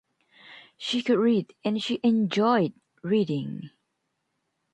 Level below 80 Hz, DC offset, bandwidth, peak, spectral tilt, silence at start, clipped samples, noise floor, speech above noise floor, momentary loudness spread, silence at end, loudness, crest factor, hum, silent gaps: -74 dBFS; under 0.1%; 9.2 kHz; -10 dBFS; -6.5 dB/octave; 0.5 s; under 0.1%; -78 dBFS; 53 dB; 13 LU; 1.05 s; -25 LUFS; 16 dB; none; none